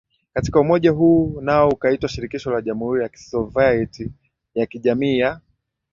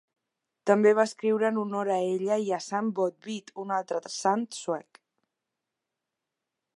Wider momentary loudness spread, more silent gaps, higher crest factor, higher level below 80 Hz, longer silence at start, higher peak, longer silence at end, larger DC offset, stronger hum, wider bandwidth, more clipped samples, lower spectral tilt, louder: about the same, 12 LU vs 12 LU; neither; about the same, 18 dB vs 22 dB; first, -44 dBFS vs -84 dBFS; second, 0.35 s vs 0.65 s; first, -2 dBFS vs -8 dBFS; second, 0.55 s vs 1.95 s; neither; neither; second, 7.4 kHz vs 11.5 kHz; neither; first, -7 dB/octave vs -5 dB/octave; first, -19 LUFS vs -28 LUFS